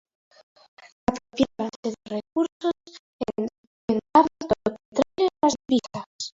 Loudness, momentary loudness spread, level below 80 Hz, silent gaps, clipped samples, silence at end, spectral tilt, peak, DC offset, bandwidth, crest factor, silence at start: -26 LUFS; 14 LU; -56 dBFS; 1.76-1.83 s, 2.52-2.60 s, 2.99-3.19 s, 3.58-3.88 s, 4.85-4.92 s, 6.06-6.19 s; under 0.1%; 0.1 s; -5 dB/octave; -4 dBFS; under 0.1%; 7.8 kHz; 22 dB; 1.1 s